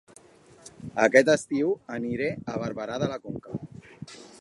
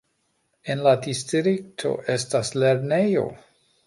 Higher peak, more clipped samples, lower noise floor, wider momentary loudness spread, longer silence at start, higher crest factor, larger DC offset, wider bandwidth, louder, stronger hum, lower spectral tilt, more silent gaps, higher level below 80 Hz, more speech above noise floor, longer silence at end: first, -2 dBFS vs -6 dBFS; neither; second, -54 dBFS vs -71 dBFS; first, 24 LU vs 8 LU; about the same, 0.65 s vs 0.65 s; first, 24 dB vs 18 dB; neither; about the same, 11.5 kHz vs 11.5 kHz; second, -26 LUFS vs -23 LUFS; neither; about the same, -5 dB/octave vs -5 dB/octave; neither; about the same, -62 dBFS vs -64 dBFS; second, 28 dB vs 48 dB; second, 0.05 s vs 0.5 s